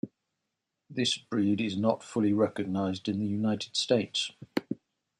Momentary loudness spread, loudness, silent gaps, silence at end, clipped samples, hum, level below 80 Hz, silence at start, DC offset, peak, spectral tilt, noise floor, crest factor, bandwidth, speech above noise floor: 9 LU; -30 LUFS; none; 0.45 s; under 0.1%; none; -72 dBFS; 0.05 s; under 0.1%; -12 dBFS; -5 dB/octave; -84 dBFS; 20 dB; 13.5 kHz; 55 dB